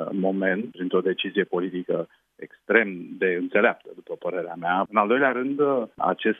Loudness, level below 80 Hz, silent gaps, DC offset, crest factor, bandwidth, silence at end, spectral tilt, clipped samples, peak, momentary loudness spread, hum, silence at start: -24 LUFS; -76 dBFS; none; under 0.1%; 20 dB; 3.8 kHz; 0 s; -8.5 dB/octave; under 0.1%; -4 dBFS; 12 LU; none; 0 s